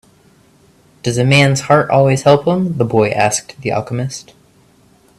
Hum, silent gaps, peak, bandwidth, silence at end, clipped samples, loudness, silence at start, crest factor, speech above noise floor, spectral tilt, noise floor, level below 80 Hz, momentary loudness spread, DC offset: none; none; 0 dBFS; 13 kHz; 0.95 s; under 0.1%; -14 LUFS; 1.05 s; 16 dB; 37 dB; -5 dB/octave; -50 dBFS; -50 dBFS; 11 LU; under 0.1%